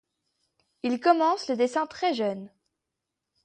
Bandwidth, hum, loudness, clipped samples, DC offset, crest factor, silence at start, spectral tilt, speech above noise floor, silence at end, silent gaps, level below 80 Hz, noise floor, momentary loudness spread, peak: 9.6 kHz; none; -26 LUFS; under 0.1%; under 0.1%; 22 dB; 0.85 s; -4.5 dB/octave; 60 dB; 0.95 s; none; -74 dBFS; -85 dBFS; 10 LU; -8 dBFS